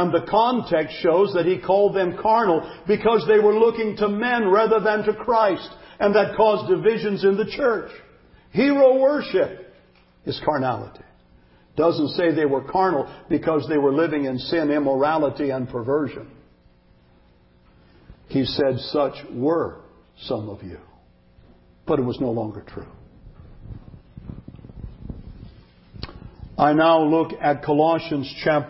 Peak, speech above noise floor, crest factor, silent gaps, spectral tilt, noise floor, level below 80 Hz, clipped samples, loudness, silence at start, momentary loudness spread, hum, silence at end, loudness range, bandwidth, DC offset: -4 dBFS; 35 dB; 18 dB; none; -10.5 dB/octave; -55 dBFS; -50 dBFS; under 0.1%; -21 LUFS; 0 s; 22 LU; none; 0 s; 11 LU; 5.8 kHz; under 0.1%